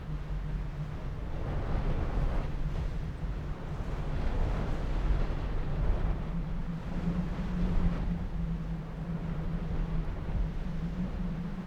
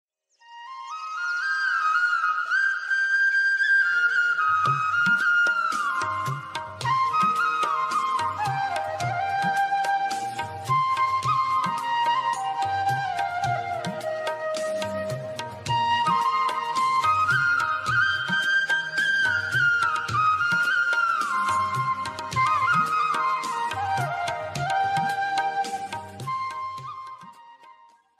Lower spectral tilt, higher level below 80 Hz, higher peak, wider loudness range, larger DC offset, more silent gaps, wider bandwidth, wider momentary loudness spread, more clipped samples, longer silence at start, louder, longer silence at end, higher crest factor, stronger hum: first, -8.5 dB/octave vs -3 dB/octave; first, -34 dBFS vs -64 dBFS; second, -16 dBFS vs -12 dBFS; second, 2 LU vs 6 LU; neither; neither; second, 7 kHz vs 15.5 kHz; second, 5 LU vs 10 LU; neither; second, 0 s vs 0.5 s; second, -36 LUFS vs -23 LUFS; second, 0 s vs 0.5 s; about the same, 14 dB vs 14 dB; neither